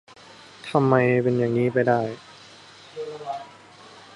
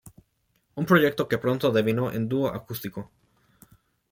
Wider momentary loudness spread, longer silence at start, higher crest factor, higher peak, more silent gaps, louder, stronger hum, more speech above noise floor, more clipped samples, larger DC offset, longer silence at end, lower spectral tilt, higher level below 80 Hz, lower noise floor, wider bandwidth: first, 22 LU vs 18 LU; first, 0.65 s vs 0.05 s; about the same, 22 dB vs 20 dB; about the same, -4 dBFS vs -6 dBFS; neither; first, -22 LUFS vs -25 LUFS; neither; second, 27 dB vs 46 dB; neither; neither; second, 0.15 s vs 1.1 s; first, -8 dB/octave vs -6.5 dB/octave; about the same, -64 dBFS vs -60 dBFS; second, -47 dBFS vs -71 dBFS; second, 11.5 kHz vs 17 kHz